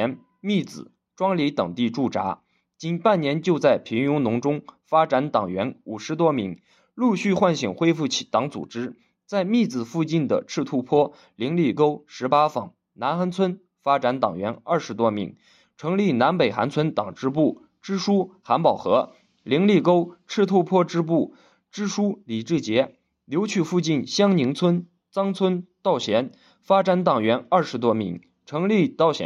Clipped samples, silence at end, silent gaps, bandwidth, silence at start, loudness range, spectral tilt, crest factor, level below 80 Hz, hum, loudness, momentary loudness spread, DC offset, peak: under 0.1%; 0 s; none; 10.5 kHz; 0 s; 2 LU; -6 dB/octave; 18 dB; -70 dBFS; none; -23 LUFS; 11 LU; under 0.1%; -4 dBFS